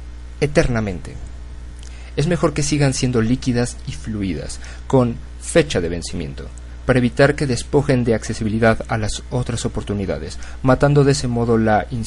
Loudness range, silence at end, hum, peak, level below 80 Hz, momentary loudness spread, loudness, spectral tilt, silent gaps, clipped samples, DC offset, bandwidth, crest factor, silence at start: 2 LU; 0 s; none; 0 dBFS; -32 dBFS; 16 LU; -19 LUFS; -6 dB/octave; none; under 0.1%; under 0.1%; 11.5 kHz; 18 dB; 0 s